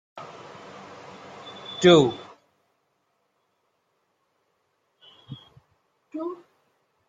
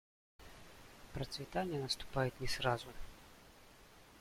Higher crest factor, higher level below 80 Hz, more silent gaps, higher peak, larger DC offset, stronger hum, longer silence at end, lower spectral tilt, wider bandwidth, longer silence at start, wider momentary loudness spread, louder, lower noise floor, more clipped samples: about the same, 24 dB vs 22 dB; second, -68 dBFS vs -56 dBFS; neither; first, -4 dBFS vs -20 dBFS; neither; neither; first, 0.75 s vs 0 s; about the same, -5.5 dB/octave vs -4.5 dB/octave; second, 7.6 kHz vs 16.5 kHz; second, 0.15 s vs 0.4 s; first, 28 LU vs 23 LU; first, -21 LUFS vs -40 LUFS; first, -73 dBFS vs -61 dBFS; neither